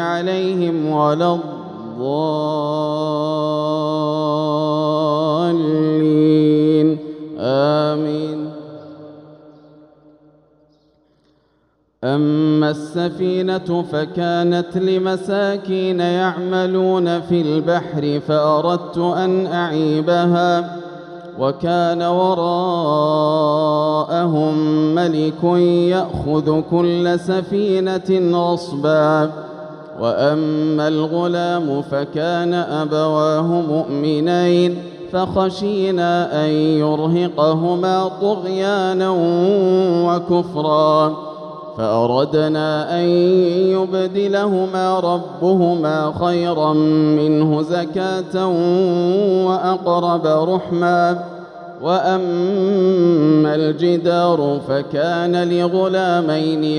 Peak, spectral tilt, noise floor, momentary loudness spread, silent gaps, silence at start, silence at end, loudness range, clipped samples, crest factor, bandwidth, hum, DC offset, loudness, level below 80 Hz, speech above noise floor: -4 dBFS; -7.5 dB/octave; -62 dBFS; 6 LU; none; 0 s; 0 s; 3 LU; under 0.1%; 14 dB; 10 kHz; none; under 0.1%; -17 LUFS; -54 dBFS; 45 dB